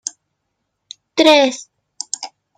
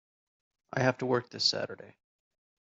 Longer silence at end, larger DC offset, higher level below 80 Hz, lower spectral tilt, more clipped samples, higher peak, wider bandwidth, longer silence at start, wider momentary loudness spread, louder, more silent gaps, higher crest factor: second, 0.3 s vs 0.9 s; neither; first, -68 dBFS vs -74 dBFS; second, -1 dB/octave vs -3 dB/octave; neither; first, 0 dBFS vs -12 dBFS; first, 14 kHz vs 8 kHz; first, 1.15 s vs 0.7 s; first, 20 LU vs 12 LU; first, -15 LUFS vs -30 LUFS; neither; second, 18 dB vs 24 dB